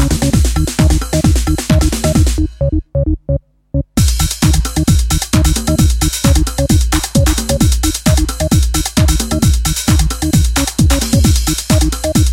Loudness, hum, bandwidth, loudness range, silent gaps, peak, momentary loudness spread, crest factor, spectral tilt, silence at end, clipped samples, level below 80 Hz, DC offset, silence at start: -13 LUFS; none; 17 kHz; 2 LU; none; 0 dBFS; 4 LU; 12 dB; -5 dB/octave; 0 s; under 0.1%; -16 dBFS; under 0.1%; 0 s